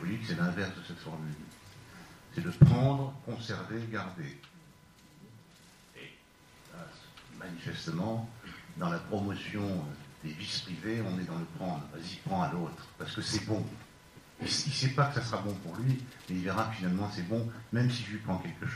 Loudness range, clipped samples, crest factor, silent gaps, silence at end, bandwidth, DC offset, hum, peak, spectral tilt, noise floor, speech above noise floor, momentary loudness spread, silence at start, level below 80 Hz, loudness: 12 LU; under 0.1%; 26 dB; none; 0 s; 14.5 kHz; under 0.1%; none; -8 dBFS; -6 dB/octave; -59 dBFS; 26 dB; 19 LU; 0 s; -60 dBFS; -34 LUFS